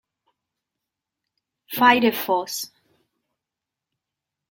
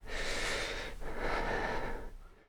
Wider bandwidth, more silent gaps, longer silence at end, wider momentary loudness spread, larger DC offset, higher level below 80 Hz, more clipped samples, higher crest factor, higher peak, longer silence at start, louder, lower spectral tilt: about the same, 17 kHz vs 18 kHz; neither; first, 1.85 s vs 0.15 s; first, 16 LU vs 9 LU; neither; second, -70 dBFS vs -42 dBFS; neither; first, 24 dB vs 16 dB; first, -2 dBFS vs -20 dBFS; first, 1.7 s vs 0 s; first, -20 LUFS vs -37 LUFS; about the same, -3 dB/octave vs -3 dB/octave